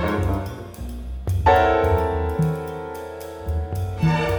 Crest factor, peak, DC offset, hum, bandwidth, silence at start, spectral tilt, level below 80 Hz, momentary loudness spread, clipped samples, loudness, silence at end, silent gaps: 18 dB; -4 dBFS; under 0.1%; none; over 20 kHz; 0 s; -7.5 dB/octave; -32 dBFS; 16 LU; under 0.1%; -22 LUFS; 0 s; none